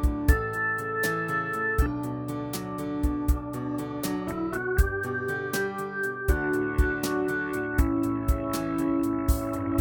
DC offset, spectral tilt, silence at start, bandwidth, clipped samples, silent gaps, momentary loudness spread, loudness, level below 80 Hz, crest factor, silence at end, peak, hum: under 0.1%; -6 dB/octave; 0 s; 19.5 kHz; under 0.1%; none; 6 LU; -28 LUFS; -32 dBFS; 18 dB; 0 s; -8 dBFS; none